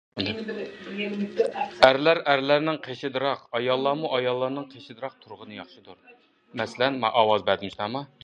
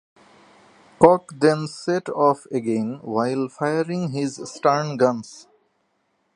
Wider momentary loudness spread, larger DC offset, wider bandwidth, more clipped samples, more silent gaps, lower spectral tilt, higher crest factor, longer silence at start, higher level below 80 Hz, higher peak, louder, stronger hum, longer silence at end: first, 19 LU vs 10 LU; neither; about the same, 10.5 kHz vs 11 kHz; neither; neither; about the same, -5.5 dB/octave vs -6 dB/octave; about the same, 26 dB vs 22 dB; second, 0.15 s vs 1 s; about the same, -64 dBFS vs -64 dBFS; about the same, 0 dBFS vs 0 dBFS; second, -25 LUFS vs -21 LUFS; neither; second, 0.2 s vs 0.95 s